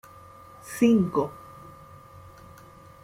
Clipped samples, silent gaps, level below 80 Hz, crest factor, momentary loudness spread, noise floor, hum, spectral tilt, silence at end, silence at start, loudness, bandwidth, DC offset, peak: under 0.1%; none; -60 dBFS; 20 dB; 27 LU; -49 dBFS; none; -6.5 dB/octave; 1.7 s; 0.65 s; -24 LUFS; 16 kHz; under 0.1%; -8 dBFS